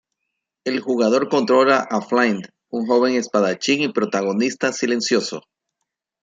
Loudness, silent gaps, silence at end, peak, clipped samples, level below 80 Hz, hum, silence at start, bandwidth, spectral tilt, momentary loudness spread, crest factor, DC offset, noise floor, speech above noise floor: -19 LUFS; none; 0.85 s; -2 dBFS; under 0.1%; -68 dBFS; none; 0.65 s; 9.4 kHz; -4 dB/octave; 11 LU; 18 dB; under 0.1%; -80 dBFS; 61 dB